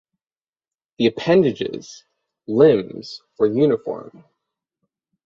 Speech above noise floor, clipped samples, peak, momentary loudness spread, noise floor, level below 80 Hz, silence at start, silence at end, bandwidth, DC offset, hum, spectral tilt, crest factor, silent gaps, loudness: over 71 dB; under 0.1%; -2 dBFS; 19 LU; under -90 dBFS; -62 dBFS; 1 s; 1.15 s; 7.4 kHz; under 0.1%; none; -7 dB/octave; 20 dB; none; -18 LUFS